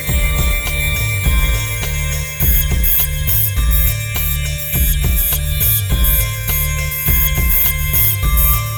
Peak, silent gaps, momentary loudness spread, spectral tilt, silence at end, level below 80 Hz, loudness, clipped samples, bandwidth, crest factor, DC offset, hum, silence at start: -2 dBFS; none; 5 LU; -3.5 dB/octave; 0 s; -18 dBFS; -14 LUFS; under 0.1%; over 20 kHz; 12 dB; under 0.1%; none; 0 s